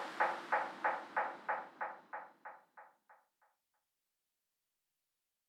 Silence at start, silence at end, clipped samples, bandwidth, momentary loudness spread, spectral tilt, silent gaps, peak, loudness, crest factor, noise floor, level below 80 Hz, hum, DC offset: 0 s; 2.35 s; under 0.1%; 14 kHz; 18 LU; -3 dB/octave; none; -20 dBFS; -40 LUFS; 24 dB; -89 dBFS; under -90 dBFS; none; under 0.1%